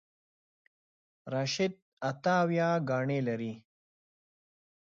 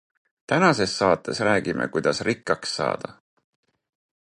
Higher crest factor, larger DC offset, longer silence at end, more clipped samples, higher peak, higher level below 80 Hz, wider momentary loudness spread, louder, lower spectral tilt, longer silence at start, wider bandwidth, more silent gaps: about the same, 18 dB vs 20 dB; neither; about the same, 1.25 s vs 1.15 s; neither; second, -16 dBFS vs -4 dBFS; second, -78 dBFS vs -58 dBFS; first, 10 LU vs 7 LU; second, -31 LUFS vs -23 LUFS; first, -6 dB/octave vs -4.5 dB/octave; first, 1.25 s vs 0.5 s; second, 7.6 kHz vs 11 kHz; first, 1.82-1.97 s vs none